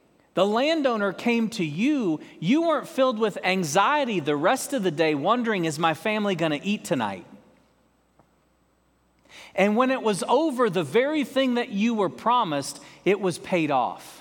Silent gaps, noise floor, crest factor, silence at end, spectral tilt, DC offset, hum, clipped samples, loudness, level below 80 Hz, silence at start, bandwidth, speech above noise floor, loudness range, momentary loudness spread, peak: none; -65 dBFS; 20 dB; 0 s; -5 dB/octave; under 0.1%; none; under 0.1%; -24 LUFS; -72 dBFS; 0.35 s; 18.5 kHz; 41 dB; 6 LU; 6 LU; -6 dBFS